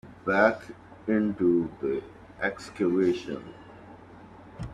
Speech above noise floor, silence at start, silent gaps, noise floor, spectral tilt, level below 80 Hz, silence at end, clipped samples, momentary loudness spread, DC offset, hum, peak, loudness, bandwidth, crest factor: 22 dB; 0.05 s; none; -49 dBFS; -7 dB/octave; -58 dBFS; 0 s; under 0.1%; 25 LU; under 0.1%; none; -6 dBFS; -27 LUFS; 9.8 kHz; 22 dB